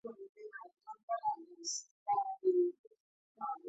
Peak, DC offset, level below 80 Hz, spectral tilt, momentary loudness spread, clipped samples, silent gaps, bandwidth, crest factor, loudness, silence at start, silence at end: -22 dBFS; under 0.1%; under -90 dBFS; -2 dB/octave; 19 LU; under 0.1%; 0.29-0.35 s, 1.03-1.08 s, 1.91-2.06 s, 2.79-2.91 s, 3.00-3.35 s; 8 kHz; 16 dB; -37 LUFS; 0.05 s; 0 s